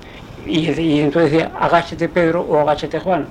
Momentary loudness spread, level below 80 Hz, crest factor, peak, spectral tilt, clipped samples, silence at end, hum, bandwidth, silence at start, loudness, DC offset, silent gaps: 5 LU; -42 dBFS; 16 dB; 0 dBFS; -7 dB/octave; under 0.1%; 0 s; none; 10 kHz; 0 s; -17 LUFS; under 0.1%; none